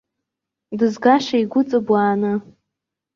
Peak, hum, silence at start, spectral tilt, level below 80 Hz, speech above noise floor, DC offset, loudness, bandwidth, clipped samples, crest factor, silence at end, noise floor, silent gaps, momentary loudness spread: -2 dBFS; none; 0.7 s; -6.5 dB/octave; -66 dBFS; 65 dB; under 0.1%; -18 LUFS; 7.4 kHz; under 0.1%; 18 dB; 0.75 s; -83 dBFS; none; 8 LU